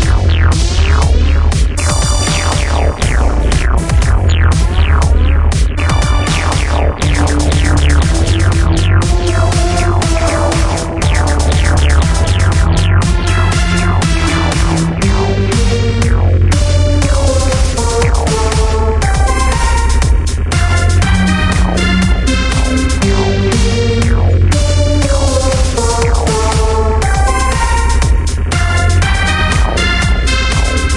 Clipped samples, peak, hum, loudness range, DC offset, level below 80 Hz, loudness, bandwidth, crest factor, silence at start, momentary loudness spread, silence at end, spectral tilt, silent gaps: under 0.1%; 0 dBFS; none; 1 LU; under 0.1%; -14 dBFS; -12 LUFS; 11.5 kHz; 10 dB; 0 s; 2 LU; 0 s; -5 dB/octave; none